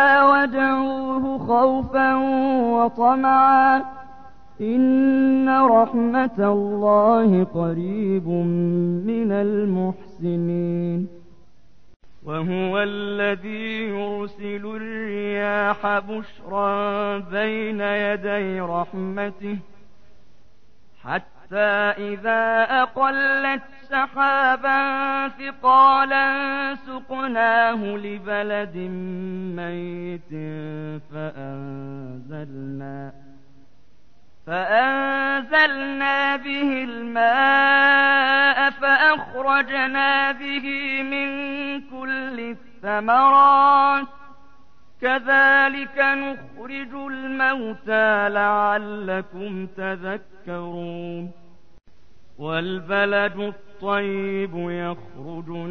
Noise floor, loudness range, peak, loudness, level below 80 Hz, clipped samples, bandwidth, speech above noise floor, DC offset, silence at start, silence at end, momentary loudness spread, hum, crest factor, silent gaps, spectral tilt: -59 dBFS; 12 LU; -6 dBFS; -20 LUFS; -58 dBFS; under 0.1%; 6.2 kHz; 38 dB; 0.9%; 0 s; 0 s; 17 LU; none; 16 dB; 11.96-12.00 s; -7.5 dB/octave